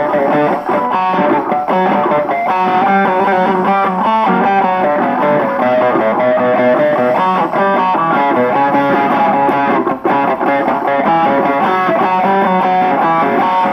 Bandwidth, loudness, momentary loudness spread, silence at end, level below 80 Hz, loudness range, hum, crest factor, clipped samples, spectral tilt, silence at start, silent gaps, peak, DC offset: 15.5 kHz; -12 LUFS; 2 LU; 0 s; -54 dBFS; 1 LU; none; 10 dB; under 0.1%; -7.5 dB/octave; 0 s; none; -2 dBFS; under 0.1%